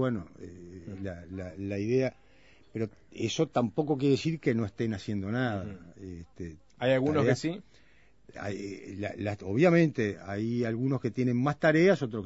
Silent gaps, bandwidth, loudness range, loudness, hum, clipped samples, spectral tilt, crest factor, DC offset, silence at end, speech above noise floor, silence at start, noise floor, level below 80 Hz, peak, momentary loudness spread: none; 8 kHz; 4 LU; -29 LUFS; none; under 0.1%; -7 dB/octave; 20 dB; 0.1%; 0 s; 31 dB; 0 s; -61 dBFS; -62 dBFS; -10 dBFS; 19 LU